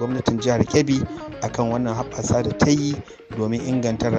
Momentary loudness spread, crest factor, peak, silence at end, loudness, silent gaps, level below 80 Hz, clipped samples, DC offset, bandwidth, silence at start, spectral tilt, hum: 10 LU; 18 dB; -4 dBFS; 0 s; -22 LUFS; none; -44 dBFS; under 0.1%; under 0.1%; 8.4 kHz; 0 s; -6 dB/octave; none